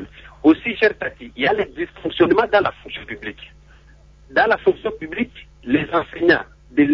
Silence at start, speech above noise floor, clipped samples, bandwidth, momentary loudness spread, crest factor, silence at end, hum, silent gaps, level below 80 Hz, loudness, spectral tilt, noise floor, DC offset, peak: 0 s; 28 dB; under 0.1%; 6.2 kHz; 15 LU; 18 dB; 0 s; none; none; -48 dBFS; -19 LUFS; -7 dB/octave; -48 dBFS; under 0.1%; -2 dBFS